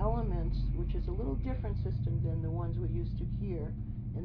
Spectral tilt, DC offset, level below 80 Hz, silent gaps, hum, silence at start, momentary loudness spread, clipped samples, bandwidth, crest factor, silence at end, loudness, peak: -11.5 dB/octave; under 0.1%; -36 dBFS; none; none; 0 s; 4 LU; under 0.1%; 5.2 kHz; 14 dB; 0 s; -35 LUFS; -18 dBFS